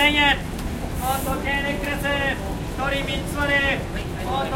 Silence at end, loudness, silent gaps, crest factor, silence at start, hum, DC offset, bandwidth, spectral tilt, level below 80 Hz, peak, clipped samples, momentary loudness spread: 0 s; -23 LUFS; none; 18 dB; 0 s; none; under 0.1%; 16 kHz; -4 dB/octave; -32 dBFS; -6 dBFS; under 0.1%; 10 LU